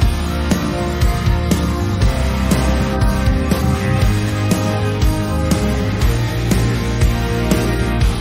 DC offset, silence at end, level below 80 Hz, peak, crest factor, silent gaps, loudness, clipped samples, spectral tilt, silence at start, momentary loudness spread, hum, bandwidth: under 0.1%; 0 s; -20 dBFS; -4 dBFS; 12 dB; none; -17 LUFS; under 0.1%; -6 dB/octave; 0 s; 2 LU; none; 16 kHz